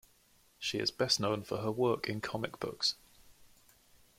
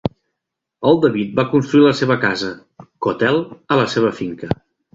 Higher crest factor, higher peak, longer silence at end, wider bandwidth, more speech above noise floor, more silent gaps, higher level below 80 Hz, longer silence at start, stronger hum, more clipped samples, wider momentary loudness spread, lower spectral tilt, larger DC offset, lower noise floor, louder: first, 22 dB vs 16 dB; second, -14 dBFS vs -2 dBFS; first, 0.75 s vs 0.4 s; first, 16.5 kHz vs 7.8 kHz; second, 33 dB vs 64 dB; neither; second, -68 dBFS vs -50 dBFS; first, 0.6 s vs 0.05 s; neither; neither; second, 9 LU vs 13 LU; second, -3.5 dB/octave vs -6.5 dB/octave; neither; second, -67 dBFS vs -80 dBFS; second, -34 LUFS vs -17 LUFS